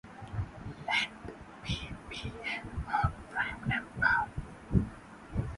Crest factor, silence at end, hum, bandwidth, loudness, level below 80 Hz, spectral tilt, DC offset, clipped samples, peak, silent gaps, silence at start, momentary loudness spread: 22 dB; 0 s; none; 11.5 kHz; -34 LUFS; -46 dBFS; -5.5 dB/octave; under 0.1%; under 0.1%; -12 dBFS; none; 0.05 s; 13 LU